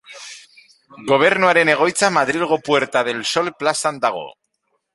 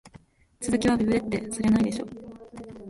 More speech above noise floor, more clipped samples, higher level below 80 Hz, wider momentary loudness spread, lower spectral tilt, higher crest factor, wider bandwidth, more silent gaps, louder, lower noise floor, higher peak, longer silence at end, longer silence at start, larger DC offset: first, 53 dB vs 30 dB; neither; second, -64 dBFS vs -50 dBFS; about the same, 19 LU vs 20 LU; second, -3 dB/octave vs -5.5 dB/octave; about the same, 18 dB vs 16 dB; about the same, 11.5 kHz vs 11.5 kHz; neither; first, -17 LUFS vs -25 LUFS; first, -70 dBFS vs -54 dBFS; first, -2 dBFS vs -12 dBFS; first, 0.65 s vs 0 s; about the same, 0.1 s vs 0.05 s; neither